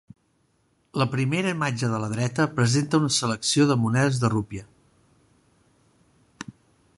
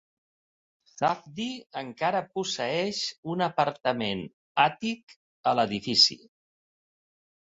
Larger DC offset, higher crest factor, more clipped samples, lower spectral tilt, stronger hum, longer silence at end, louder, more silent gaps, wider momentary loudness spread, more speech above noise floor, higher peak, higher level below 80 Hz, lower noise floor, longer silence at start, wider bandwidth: neither; about the same, 20 dB vs 24 dB; neither; first, -5 dB/octave vs -3.5 dB/octave; neither; second, 0.45 s vs 1.4 s; first, -23 LUFS vs -27 LUFS; second, none vs 3.18-3.23 s, 4.33-4.55 s, 5.03-5.07 s, 5.16-5.44 s; first, 18 LU vs 14 LU; second, 44 dB vs over 62 dB; about the same, -6 dBFS vs -6 dBFS; first, -58 dBFS vs -68 dBFS; second, -67 dBFS vs under -90 dBFS; about the same, 0.95 s vs 0.95 s; first, 11.5 kHz vs 8.4 kHz